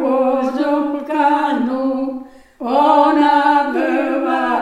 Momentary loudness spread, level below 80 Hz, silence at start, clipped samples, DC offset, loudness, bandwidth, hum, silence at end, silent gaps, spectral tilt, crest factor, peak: 8 LU; -56 dBFS; 0 s; under 0.1%; under 0.1%; -16 LUFS; 11.5 kHz; none; 0 s; none; -5 dB/octave; 14 dB; -2 dBFS